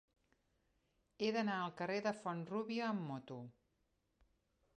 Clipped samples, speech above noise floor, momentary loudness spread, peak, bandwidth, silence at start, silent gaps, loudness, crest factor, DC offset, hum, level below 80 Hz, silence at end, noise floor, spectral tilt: under 0.1%; 41 dB; 12 LU; -26 dBFS; 9.4 kHz; 1.2 s; none; -41 LUFS; 18 dB; under 0.1%; none; -82 dBFS; 1.25 s; -82 dBFS; -6 dB/octave